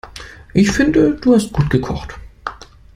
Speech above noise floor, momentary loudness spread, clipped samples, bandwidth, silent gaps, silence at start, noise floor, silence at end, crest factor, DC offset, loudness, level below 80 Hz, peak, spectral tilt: 22 dB; 19 LU; under 0.1%; 15.5 kHz; none; 0.05 s; -36 dBFS; 0.4 s; 16 dB; under 0.1%; -15 LUFS; -34 dBFS; -2 dBFS; -6.5 dB/octave